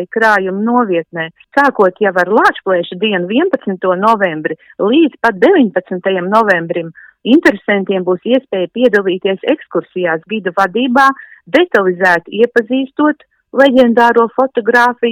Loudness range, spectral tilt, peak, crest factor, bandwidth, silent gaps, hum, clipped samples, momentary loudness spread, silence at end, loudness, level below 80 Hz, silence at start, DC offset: 2 LU; -6 dB/octave; 0 dBFS; 12 dB; 16.5 kHz; none; none; 0.1%; 8 LU; 0 s; -12 LUFS; -56 dBFS; 0 s; under 0.1%